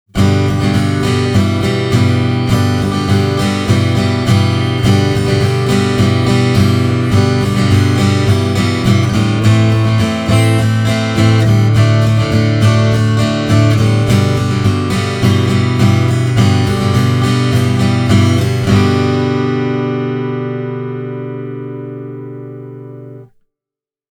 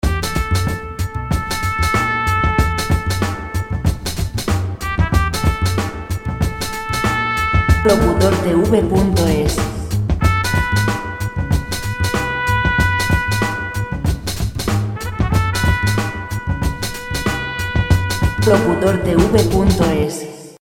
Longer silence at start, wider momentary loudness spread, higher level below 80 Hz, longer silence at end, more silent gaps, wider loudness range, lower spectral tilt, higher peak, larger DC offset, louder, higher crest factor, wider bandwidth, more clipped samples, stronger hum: about the same, 0.15 s vs 0.05 s; about the same, 10 LU vs 9 LU; second, -36 dBFS vs -24 dBFS; first, 0.85 s vs 0.1 s; neither; about the same, 6 LU vs 4 LU; about the same, -6.5 dB/octave vs -5.5 dB/octave; about the same, 0 dBFS vs 0 dBFS; neither; first, -12 LUFS vs -18 LUFS; about the same, 12 dB vs 16 dB; second, 13.5 kHz vs 17 kHz; neither; neither